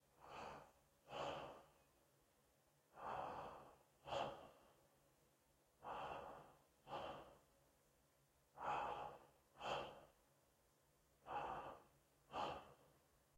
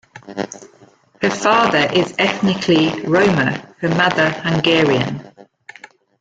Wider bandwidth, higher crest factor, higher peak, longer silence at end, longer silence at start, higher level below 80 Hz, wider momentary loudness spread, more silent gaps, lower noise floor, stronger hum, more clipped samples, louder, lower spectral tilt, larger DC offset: first, 16 kHz vs 9.2 kHz; first, 22 dB vs 16 dB; second, -34 dBFS vs -2 dBFS; second, 0.4 s vs 0.8 s; about the same, 0.15 s vs 0.15 s; second, -78 dBFS vs -52 dBFS; first, 17 LU vs 14 LU; neither; first, -79 dBFS vs -44 dBFS; neither; neither; second, -52 LUFS vs -16 LUFS; about the same, -4 dB/octave vs -5 dB/octave; neither